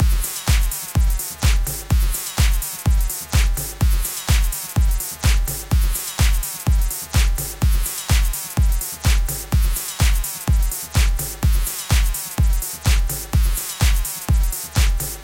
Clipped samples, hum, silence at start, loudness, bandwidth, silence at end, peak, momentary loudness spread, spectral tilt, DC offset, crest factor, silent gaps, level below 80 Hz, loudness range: under 0.1%; none; 0 s; -21 LUFS; 17 kHz; 0 s; -4 dBFS; 2 LU; -3.5 dB/octave; under 0.1%; 14 dB; none; -20 dBFS; 0 LU